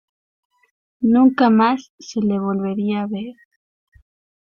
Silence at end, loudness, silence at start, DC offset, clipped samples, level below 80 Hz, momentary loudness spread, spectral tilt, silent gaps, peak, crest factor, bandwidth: 1.2 s; -18 LUFS; 1 s; under 0.1%; under 0.1%; -62 dBFS; 14 LU; -7 dB/octave; 1.90-1.98 s; -4 dBFS; 16 dB; 7 kHz